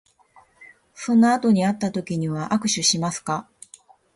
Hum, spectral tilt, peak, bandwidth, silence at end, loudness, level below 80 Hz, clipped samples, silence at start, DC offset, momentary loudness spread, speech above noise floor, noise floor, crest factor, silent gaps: none; -4 dB/octave; -6 dBFS; 11.5 kHz; 0.75 s; -21 LUFS; -62 dBFS; under 0.1%; 0.6 s; under 0.1%; 11 LU; 35 dB; -56 dBFS; 16 dB; none